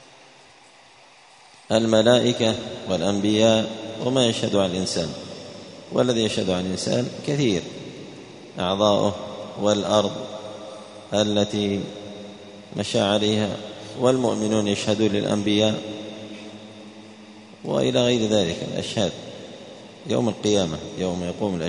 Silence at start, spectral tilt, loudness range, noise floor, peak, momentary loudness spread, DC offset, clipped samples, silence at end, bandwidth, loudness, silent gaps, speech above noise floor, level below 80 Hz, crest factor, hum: 1.7 s; -5 dB/octave; 4 LU; -51 dBFS; -2 dBFS; 19 LU; under 0.1%; under 0.1%; 0 s; 10.5 kHz; -22 LUFS; none; 29 dB; -56 dBFS; 20 dB; none